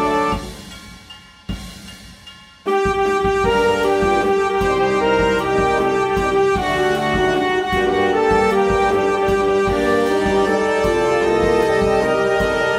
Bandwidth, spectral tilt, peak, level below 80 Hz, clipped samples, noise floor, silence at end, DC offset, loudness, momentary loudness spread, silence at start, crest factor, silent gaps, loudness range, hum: 15 kHz; -5 dB/octave; -4 dBFS; -36 dBFS; under 0.1%; -42 dBFS; 0 s; under 0.1%; -17 LUFS; 15 LU; 0 s; 14 dB; none; 4 LU; none